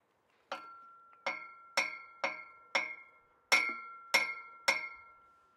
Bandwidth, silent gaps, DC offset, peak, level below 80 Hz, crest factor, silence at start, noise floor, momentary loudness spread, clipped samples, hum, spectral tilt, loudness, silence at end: 15.5 kHz; none; under 0.1%; -14 dBFS; -88 dBFS; 26 dB; 0.5 s; -73 dBFS; 18 LU; under 0.1%; none; 0.5 dB/octave; -34 LUFS; 0.45 s